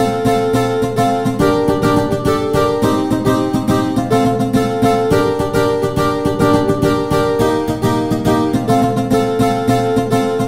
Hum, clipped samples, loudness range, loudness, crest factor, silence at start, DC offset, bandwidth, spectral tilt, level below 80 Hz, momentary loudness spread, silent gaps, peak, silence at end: none; under 0.1%; 0 LU; -15 LUFS; 14 dB; 0 s; 0.9%; 16.5 kHz; -6.5 dB/octave; -36 dBFS; 2 LU; none; 0 dBFS; 0 s